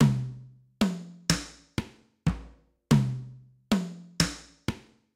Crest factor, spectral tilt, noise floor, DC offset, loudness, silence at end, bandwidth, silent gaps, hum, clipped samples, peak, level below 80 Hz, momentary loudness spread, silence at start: 24 dB; -5 dB/octave; -52 dBFS; under 0.1%; -30 LUFS; 0.35 s; 16 kHz; none; none; under 0.1%; -6 dBFS; -46 dBFS; 16 LU; 0 s